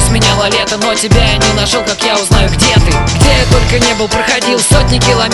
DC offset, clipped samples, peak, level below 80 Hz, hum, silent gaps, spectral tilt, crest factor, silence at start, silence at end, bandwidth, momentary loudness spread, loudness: under 0.1%; 0.6%; 0 dBFS; -16 dBFS; none; none; -4 dB/octave; 10 dB; 0 s; 0 s; 12 kHz; 3 LU; -9 LUFS